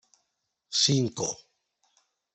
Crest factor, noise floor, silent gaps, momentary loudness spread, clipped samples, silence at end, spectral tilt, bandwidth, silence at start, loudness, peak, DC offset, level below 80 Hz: 22 dB; -80 dBFS; none; 11 LU; under 0.1%; 1 s; -3.5 dB/octave; 8.4 kHz; 0.7 s; -26 LUFS; -10 dBFS; under 0.1%; -70 dBFS